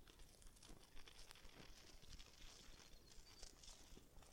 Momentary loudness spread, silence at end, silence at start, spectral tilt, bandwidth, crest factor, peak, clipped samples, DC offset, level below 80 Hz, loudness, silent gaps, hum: 4 LU; 0 s; 0 s; -2.5 dB/octave; 16.5 kHz; 26 dB; -36 dBFS; under 0.1%; under 0.1%; -66 dBFS; -64 LUFS; none; none